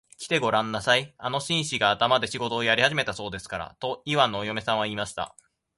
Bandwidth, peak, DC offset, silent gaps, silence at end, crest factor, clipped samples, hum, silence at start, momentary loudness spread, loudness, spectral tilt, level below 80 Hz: 11.5 kHz; -4 dBFS; under 0.1%; none; 0.5 s; 22 dB; under 0.1%; none; 0.2 s; 12 LU; -25 LUFS; -3.5 dB/octave; -58 dBFS